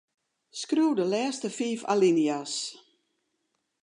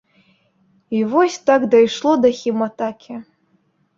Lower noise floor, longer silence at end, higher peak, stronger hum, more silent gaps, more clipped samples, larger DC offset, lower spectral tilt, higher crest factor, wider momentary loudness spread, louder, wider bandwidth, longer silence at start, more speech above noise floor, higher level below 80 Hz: first, -78 dBFS vs -62 dBFS; first, 1.1 s vs 0.75 s; second, -12 dBFS vs -2 dBFS; neither; neither; neither; neither; about the same, -4.5 dB/octave vs -5 dB/octave; about the same, 18 dB vs 16 dB; second, 13 LU vs 16 LU; second, -27 LUFS vs -17 LUFS; first, 11 kHz vs 7.6 kHz; second, 0.55 s vs 0.9 s; first, 52 dB vs 46 dB; second, -86 dBFS vs -62 dBFS